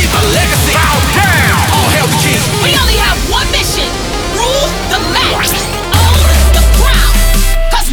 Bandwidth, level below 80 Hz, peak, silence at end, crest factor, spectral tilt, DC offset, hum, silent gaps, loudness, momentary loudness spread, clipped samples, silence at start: over 20 kHz; -14 dBFS; 0 dBFS; 0 s; 10 dB; -3.5 dB/octave; under 0.1%; none; none; -10 LUFS; 5 LU; under 0.1%; 0 s